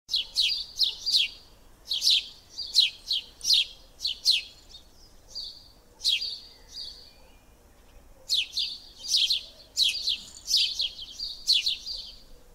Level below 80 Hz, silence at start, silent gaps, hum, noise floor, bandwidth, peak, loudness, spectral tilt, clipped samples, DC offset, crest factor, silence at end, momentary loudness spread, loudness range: -56 dBFS; 0.1 s; none; none; -56 dBFS; 16 kHz; -8 dBFS; -25 LUFS; 2.5 dB/octave; under 0.1%; under 0.1%; 22 dB; 0.1 s; 17 LU; 8 LU